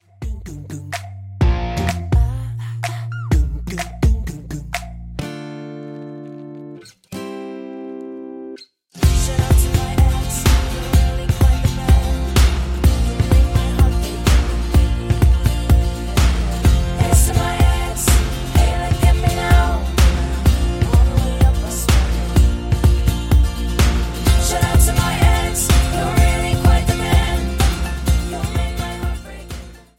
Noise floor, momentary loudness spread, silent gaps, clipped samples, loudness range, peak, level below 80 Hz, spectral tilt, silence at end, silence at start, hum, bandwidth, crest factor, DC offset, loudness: -39 dBFS; 16 LU; none; under 0.1%; 10 LU; -2 dBFS; -18 dBFS; -5 dB/octave; 0.2 s; 0.2 s; none; 16.5 kHz; 14 dB; under 0.1%; -18 LUFS